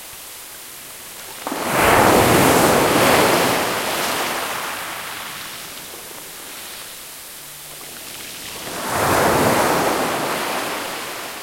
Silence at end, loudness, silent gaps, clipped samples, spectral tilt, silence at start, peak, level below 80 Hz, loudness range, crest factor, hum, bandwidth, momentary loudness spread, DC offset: 0 s; -18 LUFS; none; under 0.1%; -3 dB/octave; 0 s; 0 dBFS; -46 dBFS; 15 LU; 20 dB; none; 16.5 kHz; 20 LU; under 0.1%